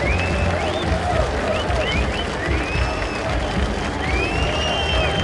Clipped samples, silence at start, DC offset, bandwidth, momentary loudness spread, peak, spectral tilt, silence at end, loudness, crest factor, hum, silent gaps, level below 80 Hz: under 0.1%; 0 s; under 0.1%; 11.5 kHz; 3 LU; -6 dBFS; -5 dB/octave; 0 s; -21 LUFS; 14 dB; none; none; -26 dBFS